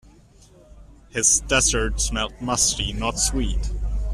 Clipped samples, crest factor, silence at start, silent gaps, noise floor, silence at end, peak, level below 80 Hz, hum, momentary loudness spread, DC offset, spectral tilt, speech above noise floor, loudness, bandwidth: under 0.1%; 20 dB; 0.7 s; none; -51 dBFS; 0 s; -2 dBFS; -30 dBFS; none; 11 LU; under 0.1%; -2 dB/octave; 29 dB; -21 LUFS; 14 kHz